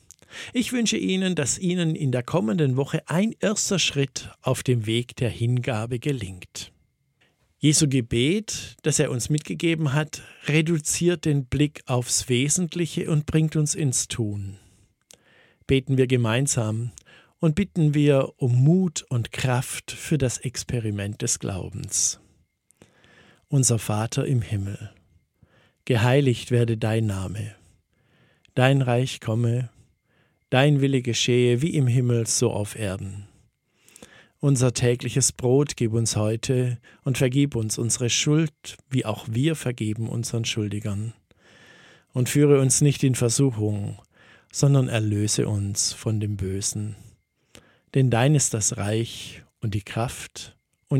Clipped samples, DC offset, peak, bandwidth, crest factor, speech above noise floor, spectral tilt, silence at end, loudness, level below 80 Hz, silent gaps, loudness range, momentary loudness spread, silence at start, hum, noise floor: under 0.1%; under 0.1%; -2 dBFS; 16 kHz; 22 dB; 43 dB; -5 dB/octave; 0 s; -23 LUFS; -52 dBFS; none; 4 LU; 12 LU; 0.3 s; none; -66 dBFS